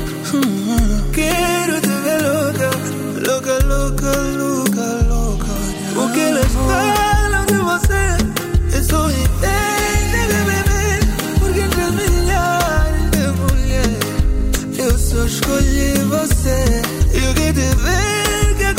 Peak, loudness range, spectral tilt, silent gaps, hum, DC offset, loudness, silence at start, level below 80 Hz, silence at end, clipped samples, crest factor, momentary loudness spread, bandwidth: -2 dBFS; 2 LU; -4.5 dB/octave; none; none; under 0.1%; -17 LUFS; 0 s; -20 dBFS; 0 s; under 0.1%; 14 dB; 3 LU; 16.5 kHz